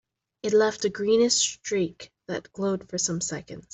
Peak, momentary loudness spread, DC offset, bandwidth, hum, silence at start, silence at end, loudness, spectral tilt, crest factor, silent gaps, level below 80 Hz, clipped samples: -8 dBFS; 14 LU; under 0.1%; 8.4 kHz; none; 0.45 s; 0.15 s; -25 LUFS; -3 dB/octave; 18 dB; none; -64 dBFS; under 0.1%